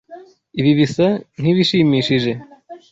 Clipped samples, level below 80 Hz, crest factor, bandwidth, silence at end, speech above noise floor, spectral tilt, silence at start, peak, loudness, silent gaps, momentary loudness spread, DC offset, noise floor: under 0.1%; -54 dBFS; 14 dB; 8 kHz; 0.15 s; 25 dB; -6.5 dB/octave; 0.1 s; -4 dBFS; -16 LUFS; none; 9 LU; under 0.1%; -41 dBFS